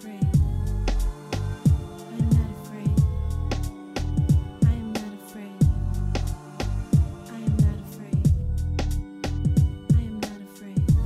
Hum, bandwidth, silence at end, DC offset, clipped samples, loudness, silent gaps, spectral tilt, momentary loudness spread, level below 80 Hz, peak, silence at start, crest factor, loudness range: none; 15 kHz; 0 s; under 0.1%; under 0.1%; -25 LUFS; none; -7.5 dB/octave; 10 LU; -28 dBFS; -10 dBFS; 0 s; 14 dB; 1 LU